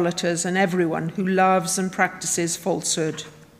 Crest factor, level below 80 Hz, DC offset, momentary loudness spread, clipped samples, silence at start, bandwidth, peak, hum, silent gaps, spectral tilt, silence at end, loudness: 18 dB; -62 dBFS; under 0.1%; 6 LU; under 0.1%; 0 s; 16 kHz; -4 dBFS; none; none; -4 dB/octave; 0.15 s; -22 LUFS